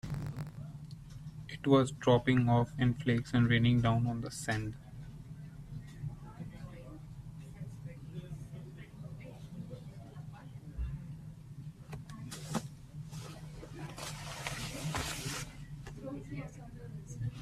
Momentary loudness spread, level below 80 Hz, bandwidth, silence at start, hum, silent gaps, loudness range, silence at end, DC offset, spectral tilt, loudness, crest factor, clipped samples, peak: 20 LU; -54 dBFS; 14 kHz; 0.05 s; none; none; 17 LU; 0 s; under 0.1%; -6 dB/octave; -35 LUFS; 22 dB; under 0.1%; -14 dBFS